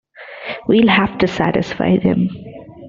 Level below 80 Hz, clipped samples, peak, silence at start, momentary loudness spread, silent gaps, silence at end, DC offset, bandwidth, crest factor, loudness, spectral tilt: -46 dBFS; under 0.1%; 0 dBFS; 0.2 s; 20 LU; none; 0 s; under 0.1%; 7.4 kHz; 16 dB; -16 LUFS; -7 dB/octave